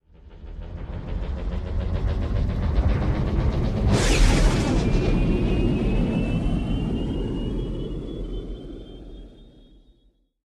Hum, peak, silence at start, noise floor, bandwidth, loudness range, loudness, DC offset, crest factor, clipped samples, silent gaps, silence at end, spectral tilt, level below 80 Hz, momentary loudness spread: none; -6 dBFS; 0.25 s; -62 dBFS; 12 kHz; 9 LU; -25 LUFS; under 0.1%; 18 dB; under 0.1%; none; 1.05 s; -6 dB/octave; -26 dBFS; 18 LU